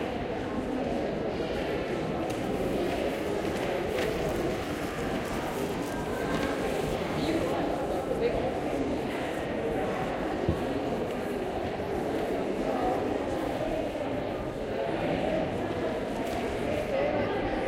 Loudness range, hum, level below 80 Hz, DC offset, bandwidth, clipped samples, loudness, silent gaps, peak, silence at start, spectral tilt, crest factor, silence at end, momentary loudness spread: 1 LU; none; -46 dBFS; under 0.1%; 16 kHz; under 0.1%; -31 LUFS; none; -14 dBFS; 0 s; -6 dB/octave; 18 dB; 0 s; 4 LU